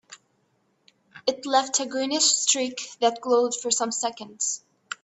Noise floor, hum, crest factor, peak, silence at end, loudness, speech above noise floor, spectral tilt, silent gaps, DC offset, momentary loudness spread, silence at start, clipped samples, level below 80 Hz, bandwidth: -69 dBFS; none; 20 dB; -6 dBFS; 0.1 s; -24 LUFS; 44 dB; 0 dB/octave; none; under 0.1%; 10 LU; 0.1 s; under 0.1%; -76 dBFS; 8.6 kHz